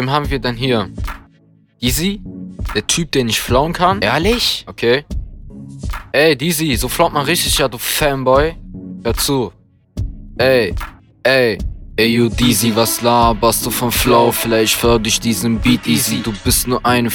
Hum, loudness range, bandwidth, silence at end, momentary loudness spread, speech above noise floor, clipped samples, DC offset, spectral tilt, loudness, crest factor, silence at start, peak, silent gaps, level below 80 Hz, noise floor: none; 4 LU; 19.5 kHz; 0 s; 15 LU; 36 dB; under 0.1%; under 0.1%; -4 dB/octave; -15 LUFS; 16 dB; 0 s; 0 dBFS; none; -30 dBFS; -51 dBFS